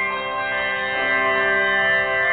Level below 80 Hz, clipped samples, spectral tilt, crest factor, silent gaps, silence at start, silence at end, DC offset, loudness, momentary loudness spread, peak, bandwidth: -52 dBFS; under 0.1%; -7 dB/octave; 12 dB; none; 0 s; 0 s; under 0.1%; -19 LUFS; 6 LU; -8 dBFS; 4.6 kHz